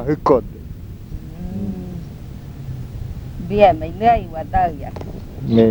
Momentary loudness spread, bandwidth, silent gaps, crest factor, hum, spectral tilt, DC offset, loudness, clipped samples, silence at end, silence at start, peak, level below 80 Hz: 20 LU; over 20 kHz; none; 20 dB; none; -8.5 dB/octave; under 0.1%; -19 LUFS; under 0.1%; 0 s; 0 s; 0 dBFS; -34 dBFS